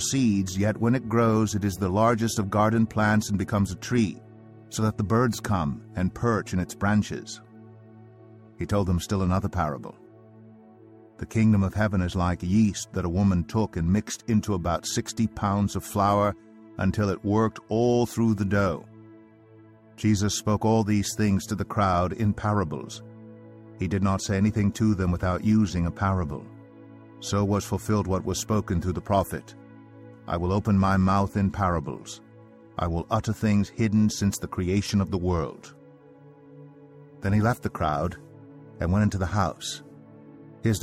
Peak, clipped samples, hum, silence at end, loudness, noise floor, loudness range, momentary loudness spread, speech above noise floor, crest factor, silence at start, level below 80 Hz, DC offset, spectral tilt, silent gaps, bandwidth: -8 dBFS; under 0.1%; none; 0 s; -25 LUFS; -52 dBFS; 4 LU; 11 LU; 27 dB; 18 dB; 0 s; -46 dBFS; under 0.1%; -6 dB/octave; none; 15.5 kHz